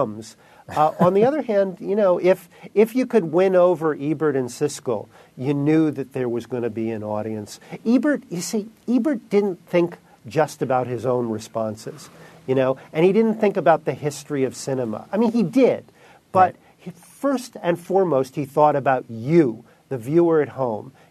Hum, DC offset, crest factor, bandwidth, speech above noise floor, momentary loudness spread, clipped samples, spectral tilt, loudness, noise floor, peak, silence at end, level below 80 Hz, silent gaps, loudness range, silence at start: none; under 0.1%; 18 dB; 13.5 kHz; 20 dB; 11 LU; under 0.1%; -6.5 dB/octave; -21 LUFS; -41 dBFS; -2 dBFS; 0.2 s; -68 dBFS; none; 4 LU; 0 s